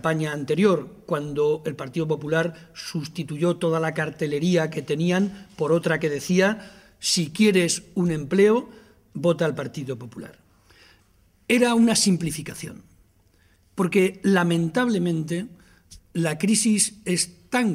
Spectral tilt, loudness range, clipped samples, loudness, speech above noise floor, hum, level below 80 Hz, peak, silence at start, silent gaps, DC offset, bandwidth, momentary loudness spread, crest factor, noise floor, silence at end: -4.5 dB/octave; 3 LU; under 0.1%; -23 LUFS; 37 dB; none; -58 dBFS; -6 dBFS; 0.05 s; none; under 0.1%; 16 kHz; 14 LU; 18 dB; -60 dBFS; 0 s